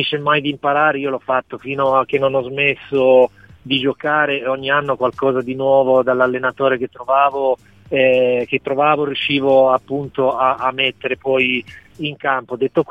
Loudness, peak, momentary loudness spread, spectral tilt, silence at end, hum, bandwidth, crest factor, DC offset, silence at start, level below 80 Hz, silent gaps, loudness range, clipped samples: -17 LUFS; -2 dBFS; 7 LU; -7 dB/octave; 0.05 s; none; 4.9 kHz; 16 dB; 0.1%; 0 s; -56 dBFS; none; 1 LU; under 0.1%